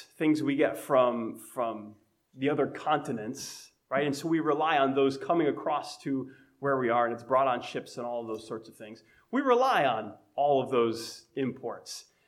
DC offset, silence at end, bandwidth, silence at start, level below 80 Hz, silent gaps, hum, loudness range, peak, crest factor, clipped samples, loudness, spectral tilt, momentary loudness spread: under 0.1%; 0.25 s; 16 kHz; 0 s; -78 dBFS; none; none; 3 LU; -10 dBFS; 18 dB; under 0.1%; -29 LUFS; -5.5 dB/octave; 14 LU